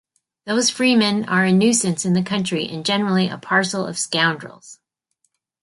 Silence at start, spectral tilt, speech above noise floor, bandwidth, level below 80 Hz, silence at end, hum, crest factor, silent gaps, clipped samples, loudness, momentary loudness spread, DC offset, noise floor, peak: 0.45 s; -4 dB/octave; 52 dB; 11.5 kHz; -64 dBFS; 0.9 s; none; 16 dB; none; under 0.1%; -19 LUFS; 8 LU; under 0.1%; -71 dBFS; -4 dBFS